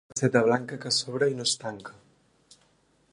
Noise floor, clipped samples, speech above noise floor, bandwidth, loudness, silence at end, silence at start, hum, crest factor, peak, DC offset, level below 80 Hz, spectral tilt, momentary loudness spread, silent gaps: -66 dBFS; under 0.1%; 39 dB; 11.5 kHz; -26 LUFS; 1.2 s; 0.15 s; none; 22 dB; -6 dBFS; under 0.1%; -70 dBFS; -3.5 dB/octave; 16 LU; none